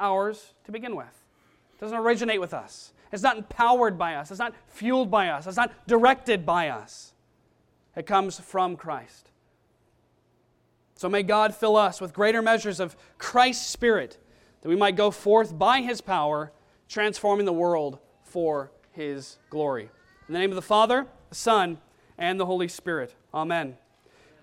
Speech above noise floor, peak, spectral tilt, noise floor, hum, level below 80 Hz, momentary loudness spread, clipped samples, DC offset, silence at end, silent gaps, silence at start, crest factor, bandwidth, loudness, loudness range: 41 dB; -6 dBFS; -4 dB/octave; -66 dBFS; none; -62 dBFS; 17 LU; under 0.1%; under 0.1%; 0.7 s; none; 0 s; 20 dB; 15.5 kHz; -25 LUFS; 6 LU